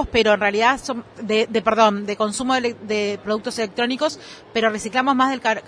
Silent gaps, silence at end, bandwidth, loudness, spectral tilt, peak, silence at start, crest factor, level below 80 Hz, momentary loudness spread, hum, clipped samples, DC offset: none; 0 s; 11 kHz; -20 LUFS; -3.5 dB/octave; -2 dBFS; 0 s; 18 dB; -46 dBFS; 8 LU; none; under 0.1%; under 0.1%